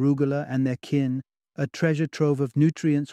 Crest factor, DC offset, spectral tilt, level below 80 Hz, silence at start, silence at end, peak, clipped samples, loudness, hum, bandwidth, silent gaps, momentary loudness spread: 16 dB; under 0.1%; -8 dB/octave; -66 dBFS; 0 s; 0 s; -8 dBFS; under 0.1%; -25 LUFS; none; 9.8 kHz; none; 9 LU